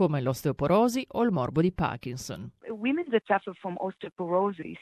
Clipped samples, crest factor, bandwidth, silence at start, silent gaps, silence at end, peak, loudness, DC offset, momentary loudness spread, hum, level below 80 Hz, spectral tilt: under 0.1%; 18 dB; 14.5 kHz; 0 s; 4.12-4.16 s; 0.05 s; -10 dBFS; -28 LUFS; under 0.1%; 13 LU; none; -54 dBFS; -6.5 dB/octave